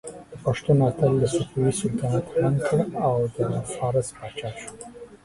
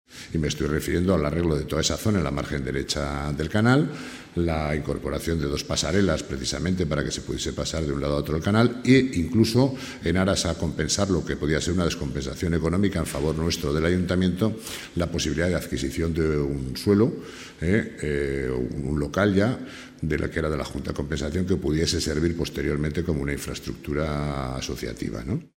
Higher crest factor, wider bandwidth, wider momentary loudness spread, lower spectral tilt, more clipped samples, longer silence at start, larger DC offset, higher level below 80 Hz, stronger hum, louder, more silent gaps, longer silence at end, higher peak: about the same, 16 dB vs 20 dB; second, 11.5 kHz vs 16 kHz; first, 15 LU vs 9 LU; about the same, -6.5 dB/octave vs -5.5 dB/octave; neither; about the same, 0.05 s vs 0.1 s; neither; second, -52 dBFS vs -38 dBFS; neither; about the same, -24 LUFS vs -25 LUFS; neither; about the same, 0.1 s vs 0.1 s; about the same, -8 dBFS vs -6 dBFS